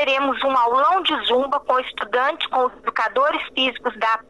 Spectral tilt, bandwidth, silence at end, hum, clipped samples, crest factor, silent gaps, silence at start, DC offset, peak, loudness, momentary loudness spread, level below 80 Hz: -3 dB/octave; 11.5 kHz; 0.1 s; none; under 0.1%; 14 dB; none; 0 s; 0.1%; -6 dBFS; -20 LUFS; 5 LU; -58 dBFS